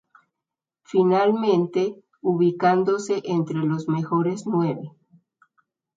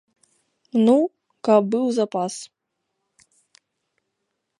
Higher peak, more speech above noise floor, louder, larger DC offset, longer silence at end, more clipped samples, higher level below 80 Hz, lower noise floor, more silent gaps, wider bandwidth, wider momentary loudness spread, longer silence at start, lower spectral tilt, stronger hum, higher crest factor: about the same, -6 dBFS vs -4 dBFS; first, 65 dB vs 59 dB; about the same, -22 LUFS vs -21 LUFS; neither; second, 1.05 s vs 2.15 s; neither; first, -70 dBFS vs -78 dBFS; first, -87 dBFS vs -78 dBFS; neither; second, 7.8 kHz vs 11.5 kHz; second, 8 LU vs 12 LU; first, 0.9 s vs 0.75 s; first, -7.5 dB/octave vs -6 dB/octave; neither; about the same, 18 dB vs 20 dB